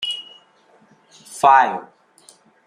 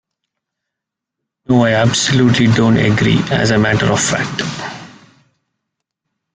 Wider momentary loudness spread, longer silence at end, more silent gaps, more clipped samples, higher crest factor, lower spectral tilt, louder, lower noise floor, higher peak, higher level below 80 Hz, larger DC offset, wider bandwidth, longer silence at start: first, 19 LU vs 11 LU; second, 0.85 s vs 1.45 s; neither; neither; about the same, 20 dB vs 16 dB; second, -2 dB/octave vs -5 dB/octave; second, -16 LUFS vs -13 LUFS; second, -55 dBFS vs -81 dBFS; about the same, -2 dBFS vs 0 dBFS; second, -74 dBFS vs -44 dBFS; neither; first, 15 kHz vs 9.6 kHz; second, 0 s vs 1.5 s